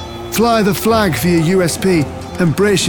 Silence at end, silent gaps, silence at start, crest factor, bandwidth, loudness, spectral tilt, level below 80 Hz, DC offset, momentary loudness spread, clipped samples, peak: 0 s; none; 0 s; 12 dB; over 20 kHz; -14 LUFS; -5 dB/octave; -38 dBFS; under 0.1%; 5 LU; under 0.1%; -2 dBFS